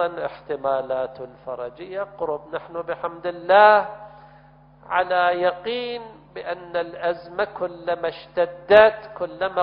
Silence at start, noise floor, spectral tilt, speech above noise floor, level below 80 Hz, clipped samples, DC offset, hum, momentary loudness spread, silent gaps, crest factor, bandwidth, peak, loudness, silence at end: 0 s; -50 dBFS; -7 dB/octave; 28 dB; -58 dBFS; under 0.1%; under 0.1%; none; 18 LU; none; 22 dB; 5.4 kHz; 0 dBFS; -22 LUFS; 0 s